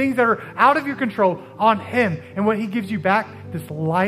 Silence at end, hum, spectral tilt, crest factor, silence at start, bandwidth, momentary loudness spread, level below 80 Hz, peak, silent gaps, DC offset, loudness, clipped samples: 0 s; none; -7 dB/octave; 18 dB; 0 s; 15.5 kHz; 9 LU; -66 dBFS; -2 dBFS; none; under 0.1%; -20 LUFS; under 0.1%